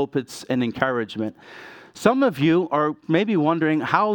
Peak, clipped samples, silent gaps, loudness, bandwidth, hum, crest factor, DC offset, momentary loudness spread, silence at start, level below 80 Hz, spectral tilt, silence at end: -2 dBFS; under 0.1%; none; -22 LUFS; 18 kHz; none; 20 dB; under 0.1%; 15 LU; 0 s; -64 dBFS; -6.5 dB/octave; 0 s